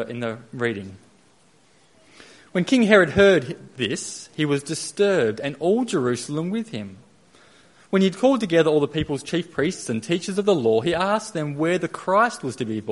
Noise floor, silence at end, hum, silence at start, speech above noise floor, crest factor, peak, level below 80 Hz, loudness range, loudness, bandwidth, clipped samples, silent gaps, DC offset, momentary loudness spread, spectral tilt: -58 dBFS; 0 s; none; 0 s; 36 dB; 22 dB; 0 dBFS; -56 dBFS; 4 LU; -22 LUFS; 11.5 kHz; under 0.1%; none; under 0.1%; 12 LU; -5 dB/octave